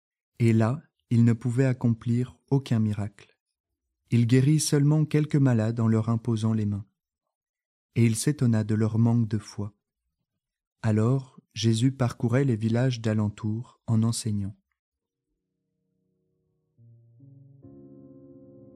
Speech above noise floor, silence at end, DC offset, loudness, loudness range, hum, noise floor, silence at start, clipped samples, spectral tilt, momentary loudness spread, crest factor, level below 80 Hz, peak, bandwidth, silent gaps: 61 dB; 0.7 s; under 0.1%; -25 LUFS; 7 LU; none; -85 dBFS; 0.4 s; under 0.1%; -7 dB/octave; 10 LU; 18 dB; -64 dBFS; -8 dBFS; 13.5 kHz; 3.40-3.46 s, 3.60-3.64 s, 7.35-7.41 s, 7.49-7.54 s, 7.65-7.89 s, 10.67-10.76 s, 14.79-14.92 s